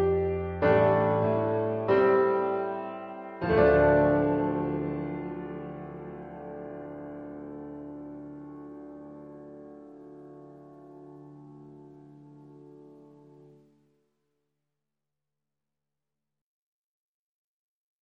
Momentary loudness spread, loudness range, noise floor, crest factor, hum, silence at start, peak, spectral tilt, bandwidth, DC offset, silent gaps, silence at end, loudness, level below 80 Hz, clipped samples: 26 LU; 24 LU; -89 dBFS; 22 dB; none; 0 s; -8 dBFS; -10 dB/octave; 5.2 kHz; under 0.1%; none; 5.15 s; -26 LUFS; -52 dBFS; under 0.1%